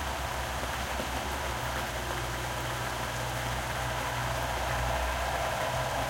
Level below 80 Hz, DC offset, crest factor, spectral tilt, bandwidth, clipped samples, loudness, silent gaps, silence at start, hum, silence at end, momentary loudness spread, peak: -40 dBFS; under 0.1%; 16 dB; -3.5 dB/octave; 16.5 kHz; under 0.1%; -32 LUFS; none; 0 s; none; 0 s; 3 LU; -16 dBFS